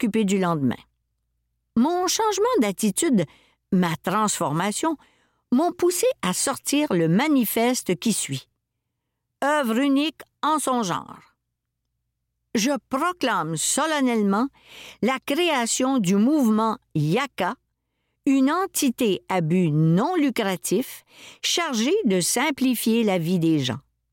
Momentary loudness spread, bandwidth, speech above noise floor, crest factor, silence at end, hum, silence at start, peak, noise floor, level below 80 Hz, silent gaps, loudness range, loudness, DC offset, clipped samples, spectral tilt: 8 LU; 17 kHz; 57 dB; 12 dB; 0.35 s; none; 0 s; -12 dBFS; -80 dBFS; -64 dBFS; none; 3 LU; -22 LUFS; under 0.1%; under 0.1%; -4.5 dB/octave